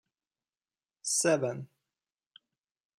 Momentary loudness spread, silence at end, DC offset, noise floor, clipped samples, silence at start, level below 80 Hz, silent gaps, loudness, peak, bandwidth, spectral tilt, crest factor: 18 LU; 1.35 s; under 0.1%; under -90 dBFS; under 0.1%; 1.05 s; -84 dBFS; none; -29 LUFS; -14 dBFS; 16 kHz; -3 dB/octave; 22 dB